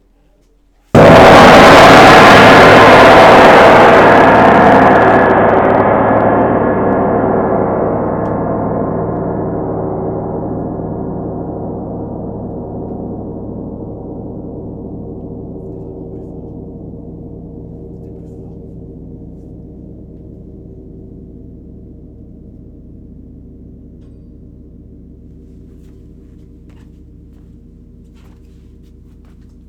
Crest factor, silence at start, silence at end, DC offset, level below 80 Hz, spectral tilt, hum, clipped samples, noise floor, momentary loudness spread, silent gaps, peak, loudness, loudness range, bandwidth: 10 dB; 0.95 s; 8.7 s; under 0.1%; -32 dBFS; -5.5 dB/octave; none; 2%; -51 dBFS; 26 LU; none; 0 dBFS; -6 LUFS; 26 LU; over 20 kHz